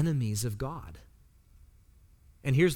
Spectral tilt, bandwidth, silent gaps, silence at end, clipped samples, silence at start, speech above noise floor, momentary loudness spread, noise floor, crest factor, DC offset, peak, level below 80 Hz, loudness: -6 dB/octave; 18 kHz; none; 0 s; under 0.1%; 0 s; 30 dB; 21 LU; -59 dBFS; 18 dB; under 0.1%; -14 dBFS; -52 dBFS; -32 LUFS